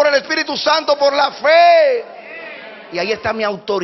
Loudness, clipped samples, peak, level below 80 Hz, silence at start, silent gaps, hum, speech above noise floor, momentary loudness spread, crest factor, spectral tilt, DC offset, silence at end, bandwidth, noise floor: -14 LUFS; under 0.1%; 0 dBFS; -58 dBFS; 0 s; none; none; 19 dB; 21 LU; 14 dB; 0 dB/octave; under 0.1%; 0 s; 6.2 kHz; -33 dBFS